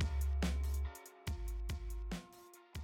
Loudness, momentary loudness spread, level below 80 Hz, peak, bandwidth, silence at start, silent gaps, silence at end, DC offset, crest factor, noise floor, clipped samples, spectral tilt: -42 LUFS; 13 LU; -40 dBFS; -28 dBFS; 17.5 kHz; 0 s; none; 0 s; under 0.1%; 12 dB; -60 dBFS; under 0.1%; -5.5 dB/octave